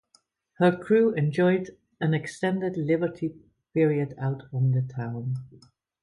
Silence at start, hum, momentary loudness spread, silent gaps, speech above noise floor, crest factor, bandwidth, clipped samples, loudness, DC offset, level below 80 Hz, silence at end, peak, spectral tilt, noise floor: 0.6 s; none; 10 LU; none; 41 dB; 18 dB; 11.5 kHz; under 0.1%; -26 LUFS; under 0.1%; -66 dBFS; 0.55 s; -8 dBFS; -8 dB/octave; -66 dBFS